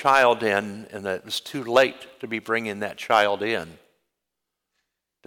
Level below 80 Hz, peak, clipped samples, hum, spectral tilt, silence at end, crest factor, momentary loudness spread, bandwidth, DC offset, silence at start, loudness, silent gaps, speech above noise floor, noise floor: -68 dBFS; -6 dBFS; under 0.1%; none; -3.5 dB/octave; 1.55 s; 18 dB; 13 LU; 18.5 kHz; under 0.1%; 0 s; -23 LUFS; none; 60 dB; -83 dBFS